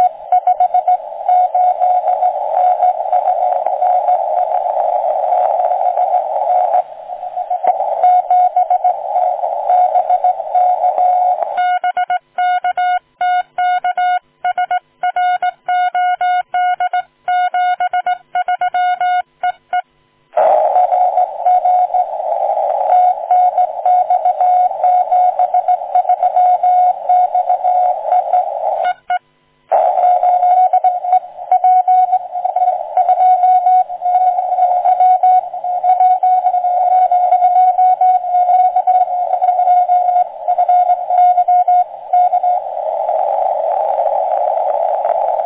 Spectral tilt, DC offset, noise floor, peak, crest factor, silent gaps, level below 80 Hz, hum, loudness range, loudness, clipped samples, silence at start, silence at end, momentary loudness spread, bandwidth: -4 dB/octave; under 0.1%; -56 dBFS; -2 dBFS; 12 dB; none; -68 dBFS; none; 4 LU; -14 LUFS; under 0.1%; 0 s; 0 s; 6 LU; 3.9 kHz